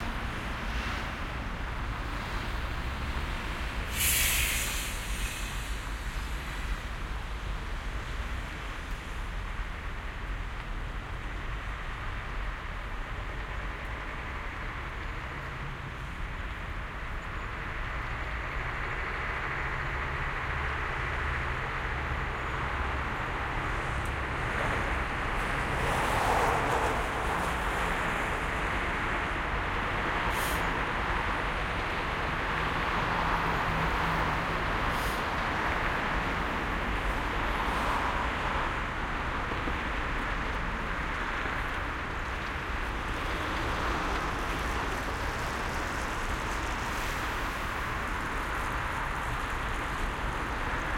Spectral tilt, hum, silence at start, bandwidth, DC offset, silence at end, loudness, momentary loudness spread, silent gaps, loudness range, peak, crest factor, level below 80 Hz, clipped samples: -4 dB/octave; none; 0 s; 16.5 kHz; under 0.1%; 0 s; -32 LUFS; 9 LU; none; 8 LU; -14 dBFS; 18 dB; -38 dBFS; under 0.1%